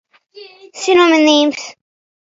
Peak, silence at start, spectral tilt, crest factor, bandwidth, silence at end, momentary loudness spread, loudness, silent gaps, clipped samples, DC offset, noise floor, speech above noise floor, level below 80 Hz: 0 dBFS; 0.35 s; -1.5 dB/octave; 16 dB; 7.8 kHz; 0.6 s; 18 LU; -12 LUFS; none; under 0.1%; under 0.1%; -40 dBFS; 28 dB; -66 dBFS